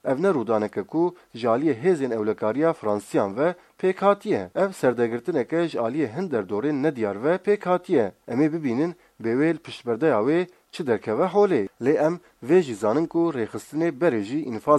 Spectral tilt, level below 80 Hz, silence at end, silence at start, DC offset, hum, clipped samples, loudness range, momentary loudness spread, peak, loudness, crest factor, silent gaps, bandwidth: -7 dB/octave; -70 dBFS; 0 s; 0.05 s; under 0.1%; none; under 0.1%; 2 LU; 6 LU; -4 dBFS; -24 LUFS; 18 dB; none; 13 kHz